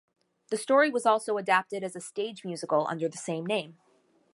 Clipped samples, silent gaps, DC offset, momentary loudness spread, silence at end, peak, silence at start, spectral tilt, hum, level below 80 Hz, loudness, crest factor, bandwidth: under 0.1%; none; under 0.1%; 12 LU; 0.6 s; -10 dBFS; 0.5 s; -4 dB/octave; none; -84 dBFS; -28 LUFS; 20 dB; 11.5 kHz